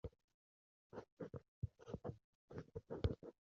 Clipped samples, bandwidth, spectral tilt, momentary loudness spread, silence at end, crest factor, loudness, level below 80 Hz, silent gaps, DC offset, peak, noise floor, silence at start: under 0.1%; 7.2 kHz; -7.5 dB/octave; 13 LU; 0.2 s; 26 dB; -51 LUFS; -60 dBFS; 0.24-0.28 s, 0.34-0.90 s, 1.12-1.17 s, 1.48-1.62 s, 2.24-2.48 s; under 0.1%; -26 dBFS; under -90 dBFS; 0.05 s